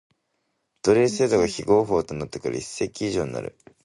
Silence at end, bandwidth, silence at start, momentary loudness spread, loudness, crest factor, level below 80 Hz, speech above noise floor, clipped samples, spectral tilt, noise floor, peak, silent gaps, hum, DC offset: 0.35 s; 11.5 kHz; 0.85 s; 11 LU; -23 LUFS; 18 dB; -52 dBFS; 52 dB; under 0.1%; -5 dB/octave; -75 dBFS; -6 dBFS; none; none; under 0.1%